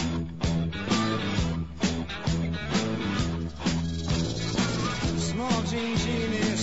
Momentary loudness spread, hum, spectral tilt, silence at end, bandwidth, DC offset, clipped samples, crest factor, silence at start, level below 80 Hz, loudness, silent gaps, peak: 3 LU; none; -5 dB/octave; 0 s; 8 kHz; 0.5%; under 0.1%; 16 dB; 0 s; -40 dBFS; -28 LUFS; none; -12 dBFS